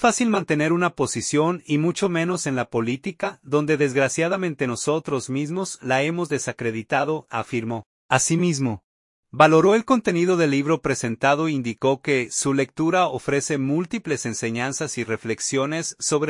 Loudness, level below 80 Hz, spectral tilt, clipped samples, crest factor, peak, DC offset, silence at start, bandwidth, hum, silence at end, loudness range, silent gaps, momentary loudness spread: -22 LUFS; -60 dBFS; -4.5 dB/octave; under 0.1%; 20 dB; -2 dBFS; under 0.1%; 0 s; 11.5 kHz; none; 0 s; 5 LU; 7.86-8.09 s, 8.84-9.23 s; 8 LU